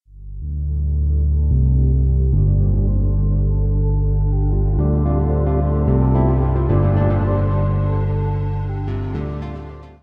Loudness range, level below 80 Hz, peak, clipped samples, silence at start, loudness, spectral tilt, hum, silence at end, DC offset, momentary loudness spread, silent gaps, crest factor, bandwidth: 2 LU; -20 dBFS; -4 dBFS; under 0.1%; 0.15 s; -19 LUFS; -12.5 dB/octave; none; 0.15 s; under 0.1%; 9 LU; none; 12 dB; 3.7 kHz